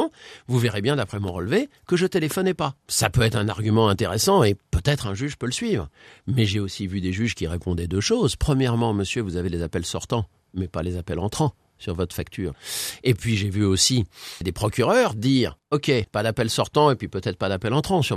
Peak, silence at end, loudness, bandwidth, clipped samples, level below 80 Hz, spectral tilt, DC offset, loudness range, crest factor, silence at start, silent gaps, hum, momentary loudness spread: -2 dBFS; 0 s; -23 LUFS; 14.5 kHz; under 0.1%; -44 dBFS; -5 dB/octave; under 0.1%; 5 LU; 20 dB; 0 s; none; none; 9 LU